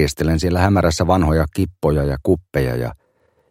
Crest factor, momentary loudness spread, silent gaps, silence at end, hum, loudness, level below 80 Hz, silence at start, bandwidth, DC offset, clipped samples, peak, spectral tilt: 16 dB; 6 LU; none; 0.55 s; none; -18 LUFS; -30 dBFS; 0 s; 16 kHz; under 0.1%; under 0.1%; -2 dBFS; -6.5 dB/octave